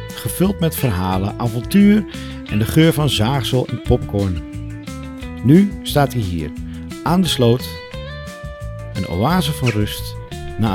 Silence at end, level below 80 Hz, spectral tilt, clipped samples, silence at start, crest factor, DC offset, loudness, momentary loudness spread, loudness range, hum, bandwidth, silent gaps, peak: 0 s; -34 dBFS; -6 dB/octave; under 0.1%; 0 s; 18 dB; under 0.1%; -18 LUFS; 17 LU; 4 LU; none; 18 kHz; none; 0 dBFS